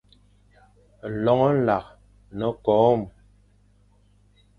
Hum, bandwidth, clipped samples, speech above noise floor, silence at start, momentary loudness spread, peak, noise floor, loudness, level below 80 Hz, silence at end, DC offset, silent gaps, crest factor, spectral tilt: 50 Hz at -50 dBFS; 6.6 kHz; under 0.1%; 38 dB; 1.05 s; 19 LU; -6 dBFS; -59 dBFS; -22 LUFS; -54 dBFS; 1.5 s; under 0.1%; none; 20 dB; -9 dB/octave